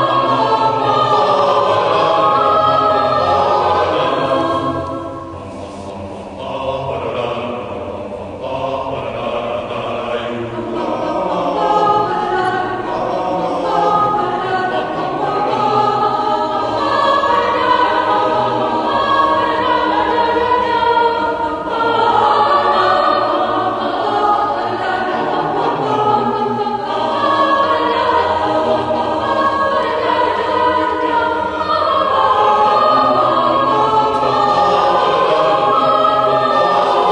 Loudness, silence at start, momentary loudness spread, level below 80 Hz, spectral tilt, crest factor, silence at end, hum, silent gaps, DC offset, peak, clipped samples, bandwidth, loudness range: -15 LUFS; 0 s; 9 LU; -48 dBFS; -5.5 dB/octave; 14 dB; 0 s; none; none; under 0.1%; 0 dBFS; under 0.1%; 10.5 kHz; 9 LU